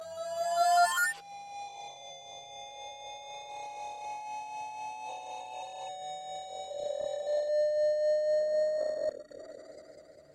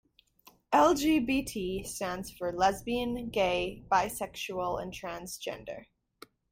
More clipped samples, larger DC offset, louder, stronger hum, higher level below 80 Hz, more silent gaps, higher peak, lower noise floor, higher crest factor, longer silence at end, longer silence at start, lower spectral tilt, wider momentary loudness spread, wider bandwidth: neither; neither; about the same, -33 LUFS vs -31 LUFS; neither; second, -78 dBFS vs -54 dBFS; neither; about the same, -14 dBFS vs -12 dBFS; second, -54 dBFS vs -62 dBFS; about the same, 18 dB vs 20 dB; second, 0 s vs 0.7 s; second, 0 s vs 0.7 s; second, -0.5 dB/octave vs -4 dB/octave; first, 18 LU vs 14 LU; about the same, 16 kHz vs 16.5 kHz